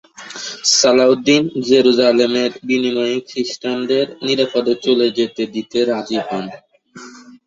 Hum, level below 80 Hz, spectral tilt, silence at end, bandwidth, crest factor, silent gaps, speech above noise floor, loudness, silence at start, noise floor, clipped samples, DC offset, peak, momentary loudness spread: none; -60 dBFS; -3 dB/octave; 0.25 s; 8 kHz; 16 dB; none; 23 dB; -16 LUFS; 0.2 s; -39 dBFS; under 0.1%; under 0.1%; 0 dBFS; 12 LU